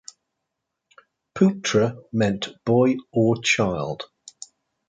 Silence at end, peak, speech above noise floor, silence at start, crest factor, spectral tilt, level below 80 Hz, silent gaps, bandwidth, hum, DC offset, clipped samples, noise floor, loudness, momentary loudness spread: 0.85 s; -4 dBFS; 60 dB; 1.35 s; 20 dB; -5.5 dB/octave; -56 dBFS; none; 9.4 kHz; none; under 0.1%; under 0.1%; -81 dBFS; -22 LUFS; 21 LU